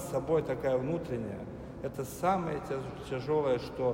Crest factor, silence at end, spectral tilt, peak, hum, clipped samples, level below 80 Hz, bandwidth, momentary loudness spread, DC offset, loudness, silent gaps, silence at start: 16 dB; 0 s; -6.5 dB/octave; -16 dBFS; none; under 0.1%; -54 dBFS; 16 kHz; 10 LU; under 0.1%; -33 LUFS; none; 0 s